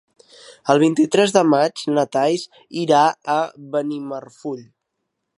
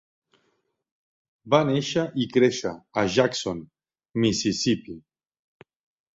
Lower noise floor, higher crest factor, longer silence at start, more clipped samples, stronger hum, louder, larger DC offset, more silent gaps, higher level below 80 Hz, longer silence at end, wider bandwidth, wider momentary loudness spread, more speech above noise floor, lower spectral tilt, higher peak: first, -77 dBFS vs -72 dBFS; about the same, 20 dB vs 22 dB; second, 0.5 s vs 1.45 s; neither; neither; first, -18 LUFS vs -24 LUFS; neither; neither; second, -72 dBFS vs -60 dBFS; second, 0.75 s vs 1.15 s; first, 11.5 kHz vs 8 kHz; first, 15 LU vs 12 LU; first, 58 dB vs 49 dB; about the same, -5 dB/octave vs -5 dB/octave; first, 0 dBFS vs -4 dBFS